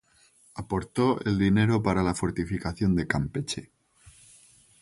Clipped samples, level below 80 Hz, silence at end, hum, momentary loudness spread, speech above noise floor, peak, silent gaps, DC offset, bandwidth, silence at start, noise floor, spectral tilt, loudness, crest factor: under 0.1%; -46 dBFS; 0.7 s; none; 11 LU; 35 dB; -8 dBFS; none; under 0.1%; 11.5 kHz; 0.55 s; -61 dBFS; -6.5 dB/octave; -27 LUFS; 20 dB